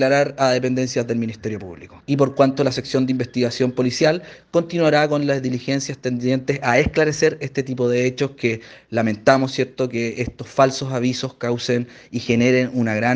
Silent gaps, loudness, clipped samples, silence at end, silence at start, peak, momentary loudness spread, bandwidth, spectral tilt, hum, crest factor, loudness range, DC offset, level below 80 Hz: none; -20 LUFS; under 0.1%; 0 s; 0 s; 0 dBFS; 9 LU; 9.4 kHz; -5.5 dB/octave; none; 20 dB; 2 LU; under 0.1%; -48 dBFS